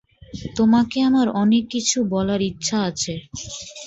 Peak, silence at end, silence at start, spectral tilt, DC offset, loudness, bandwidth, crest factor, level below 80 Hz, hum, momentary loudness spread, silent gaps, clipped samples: -6 dBFS; 0 s; 0.35 s; -4.5 dB/octave; under 0.1%; -20 LUFS; 8.2 kHz; 14 dB; -50 dBFS; none; 14 LU; none; under 0.1%